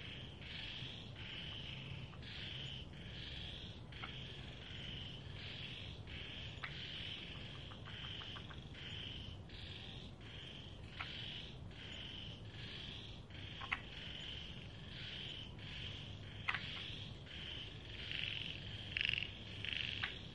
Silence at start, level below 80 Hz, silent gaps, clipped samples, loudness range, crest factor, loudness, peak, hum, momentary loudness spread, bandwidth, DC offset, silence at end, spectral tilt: 0 s; -60 dBFS; none; under 0.1%; 6 LU; 28 dB; -47 LUFS; -20 dBFS; none; 9 LU; 11 kHz; under 0.1%; 0 s; -4.5 dB/octave